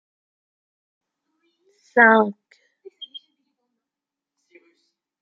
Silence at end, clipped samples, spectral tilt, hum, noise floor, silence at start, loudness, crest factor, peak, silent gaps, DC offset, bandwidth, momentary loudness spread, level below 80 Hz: 2.15 s; under 0.1%; -6.5 dB/octave; none; -87 dBFS; 1.95 s; -16 LUFS; 24 dB; -2 dBFS; none; under 0.1%; 7 kHz; 25 LU; -78 dBFS